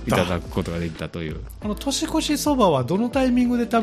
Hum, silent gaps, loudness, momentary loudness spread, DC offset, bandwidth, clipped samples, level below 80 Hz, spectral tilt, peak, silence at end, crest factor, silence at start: none; none; -23 LUFS; 12 LU; under 0.1%; 15 kHz; under 0.1%; -38 dBFS; -5 dB/octave; -4 dBFS; 0 s; 18 dB; 0 s